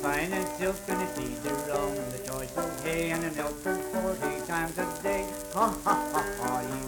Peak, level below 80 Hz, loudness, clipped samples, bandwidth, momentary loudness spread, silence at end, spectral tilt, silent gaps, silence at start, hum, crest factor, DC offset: -12 dBFS; -50 dBFS; -31 LUFS; under 0.1%; 19 kHz; 6 LU; 0 s; -4 dB/octave; none; 0 s; none; 18 dB; under 0.1%